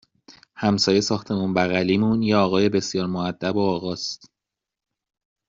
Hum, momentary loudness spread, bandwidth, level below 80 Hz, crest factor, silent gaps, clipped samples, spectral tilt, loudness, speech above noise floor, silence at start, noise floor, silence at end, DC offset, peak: none; 8 LU; 7.6 kHz; -58 dBFS; 18 dB; none; under 0.1%; -4.5 dB/octave; -22 LUFS; 65 dB; 0.3 s; -86 dBFS; 1.35 s; under 0.1%; -4 dBFS